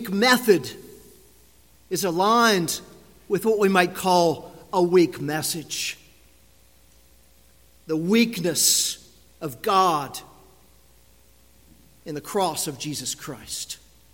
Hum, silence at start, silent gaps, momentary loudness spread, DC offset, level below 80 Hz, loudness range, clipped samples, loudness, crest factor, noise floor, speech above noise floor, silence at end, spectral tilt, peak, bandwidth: none; 0 s; none; 17 LU; 0.1%; -60 dBFS; 9 LU; under 0.1%; -22 LUFS; 22 dB; -56 dBFS; 34 dB; 0.4 s; -3.5 dB/octave; -4 dBFS; 17 kHz